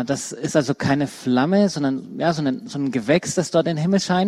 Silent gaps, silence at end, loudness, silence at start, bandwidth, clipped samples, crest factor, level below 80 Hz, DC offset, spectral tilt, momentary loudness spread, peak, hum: none; 0 s; -21 LUFS; 0 s; 13 kHz; under 0.1%; 16 dB; -58 dBFS; under 0.1%; -5.5 dB/octave; 6 LU; -4 dBFS; none